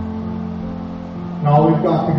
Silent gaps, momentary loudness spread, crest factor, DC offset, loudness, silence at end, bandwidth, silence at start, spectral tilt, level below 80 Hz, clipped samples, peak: none; 15 LU; 16 dB; under 0.1%; -19 LUFS; 0 s; 5.8 kHz; 0 s; -10.5 dB/octave; -42 dBFS; under 0.1%; -2 dBFS